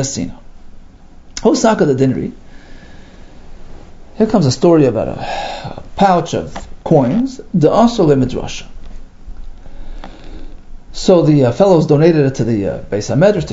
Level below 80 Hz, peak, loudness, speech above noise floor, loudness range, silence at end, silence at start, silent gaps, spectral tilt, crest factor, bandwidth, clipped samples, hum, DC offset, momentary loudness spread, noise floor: -32 dBFS; 0 dBFS; -13 LUFS; 25 dB; 4 LU; 0 s; 0 s; none; -6.5 dB/octave; 14 dB; 8 kHz; under 0.1%; none; under 0.1%; 18 LU; -37 dBFS